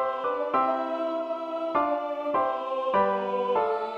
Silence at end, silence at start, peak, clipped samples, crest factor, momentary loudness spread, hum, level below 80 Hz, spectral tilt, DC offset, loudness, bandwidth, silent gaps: 0 s; 0 s; -12 dBFS; under 0.1%; 16 dB; 5 LU; none; -68 dBFS; -6.5 dB/octave; under 0.1%; -27 LUFS; 7 kHz; none